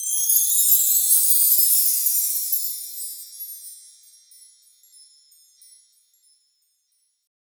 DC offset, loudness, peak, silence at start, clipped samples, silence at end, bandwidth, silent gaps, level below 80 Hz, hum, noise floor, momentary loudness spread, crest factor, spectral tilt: under 0.1%; -16 LUFS; -4 dBFS; 0 s; under 0.1%; 3.7 s; over 20 kHz; none; under -90 dBFS; none; -70 dBFS; 20 LU; 20 dB; 13 dB/octave